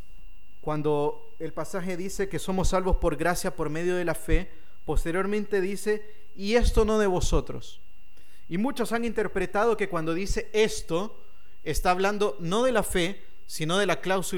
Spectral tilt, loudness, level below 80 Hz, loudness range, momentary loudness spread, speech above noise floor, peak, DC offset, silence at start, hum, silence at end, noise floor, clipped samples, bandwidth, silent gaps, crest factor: -5 dB/octave; -27 LUFS; -34 dBFS; 2 LU; 11 LU; 32 dB; -8 dBFS; 3%; 0.1 s; none; 0 s; -58 dBFS; under 0.1%; 17.5 kHz; none; 20 dB